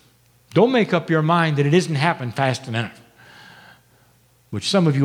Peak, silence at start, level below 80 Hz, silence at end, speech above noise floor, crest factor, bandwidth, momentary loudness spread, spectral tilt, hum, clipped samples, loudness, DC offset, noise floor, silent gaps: -2 dBFS; 0.55 s; -66 dBFS; 0 s; 38 dB; 18 dB; 13.5 kHz; 10 LU; -6 dB/octave; none; under 0.1%; -19 LUFS; under 0.1%; -57 dBFS; none